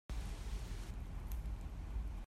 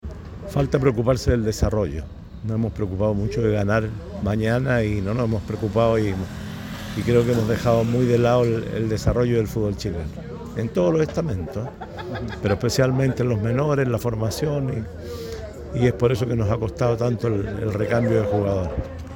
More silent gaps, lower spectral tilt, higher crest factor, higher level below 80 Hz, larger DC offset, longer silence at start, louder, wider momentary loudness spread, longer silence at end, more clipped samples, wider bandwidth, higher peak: neither; second, -5.5 dB/octave vs -7 dB/octave; about the same, 14 dB vs 16 dB; second, -44 dBFS vs -38 dBFS; neither; about the same, 0.1 s vs 0.05 s; second, -47 LUFS vs -22 LUFS; second, 2 LU vs 12 LU; about the same, 0 s vs 0 s; neither; second, 14.5 kHz vs 17 kHz; second, -30 dBFS vs -6 dBFS